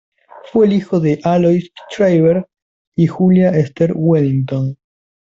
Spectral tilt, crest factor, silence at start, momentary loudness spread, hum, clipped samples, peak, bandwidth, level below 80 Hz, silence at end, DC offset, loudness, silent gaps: -9 dB/octave; 12 dB; 0.55 s; 8 LU; none; under 0.1%; -2 dBFS; 7.4 kHz; -54 dBFS; 0.55 s; under 0.1%; -15 LUFS; 2.62-2.92 s